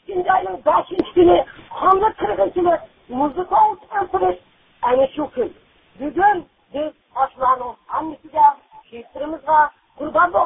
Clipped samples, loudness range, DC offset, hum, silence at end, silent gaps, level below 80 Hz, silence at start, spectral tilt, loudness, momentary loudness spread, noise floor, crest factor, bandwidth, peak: under 0.1%; 4 LU; under 0.1%; none; 0 s; none; -50 dBFS; 0.1 s; -10 dB/octave; -19 LUFS; 14 LU; -49 dBFS; 16 dB; 4.2 kHz; -2 dBFS